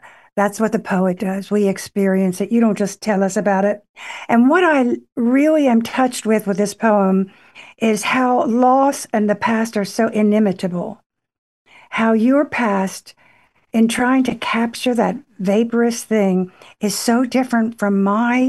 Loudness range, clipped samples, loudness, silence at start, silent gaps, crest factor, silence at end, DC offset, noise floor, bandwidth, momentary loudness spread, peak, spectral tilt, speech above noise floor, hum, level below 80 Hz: 3 LU; under 0.1%; -17 LUFS; 0.05 s; 3.89-3.94 s, 5.12-5.16 s, 11.06-11.10 s, 11.38-11.65 s; 16 dB; 0 s; under 0.1%; -55 dBFS; 12.5 kHz; 8 LU; -2 dBFS; -5.5 dB/octave; 38 dB; none; -62 dBFS